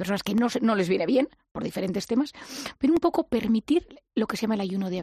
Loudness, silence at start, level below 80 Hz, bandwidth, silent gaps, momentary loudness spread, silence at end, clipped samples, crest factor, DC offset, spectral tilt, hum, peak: -26 LUFS; 0 s; -58 dBFS; 14 kHz; 1.51-1.55 s; 9 LU; 0 s; under 0.1%; 14 dB; under 0.1%; -6 dB/octave; none; -10 dBFS